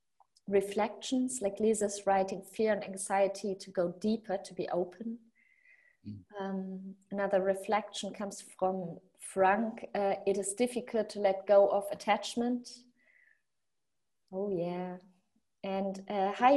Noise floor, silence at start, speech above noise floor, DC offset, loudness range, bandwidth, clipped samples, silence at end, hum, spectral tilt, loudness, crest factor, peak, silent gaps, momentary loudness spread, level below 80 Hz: -89 dBFS; 0.5 s; 57 dB; under 0.1%; 8 LU; 12.5 kHz; under 0.1%; 0 s; none; -4.5 dB/octave; -33 LUFS; 22 dB; -12 dBFS; none; 15 LU; -74 dBFS